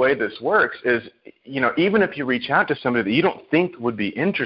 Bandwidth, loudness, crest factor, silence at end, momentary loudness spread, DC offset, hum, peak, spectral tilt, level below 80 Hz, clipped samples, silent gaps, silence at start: 5.6 kHz; -21 LUFS; 16 dB; 0 s; 6 LU; under 0.1%; none; -4 dBFS; -10.5 dB/octave; -58 dBFS; under 0.1%; none; 0 s